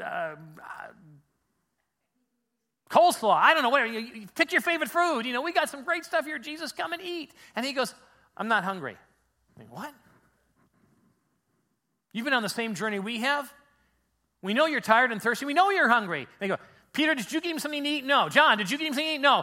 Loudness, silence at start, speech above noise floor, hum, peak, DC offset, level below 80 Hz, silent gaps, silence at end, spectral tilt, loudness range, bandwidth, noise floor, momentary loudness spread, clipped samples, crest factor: -26 LUFS; 0 s; 55 dB; none; -4 dBFS; under 0.1%; -76 dBFS; none; 0 s; -3 dB/octave; 10 LU; 16.5 kHz; -81 dBFS; 17 LU; under 0.1%; 24 dB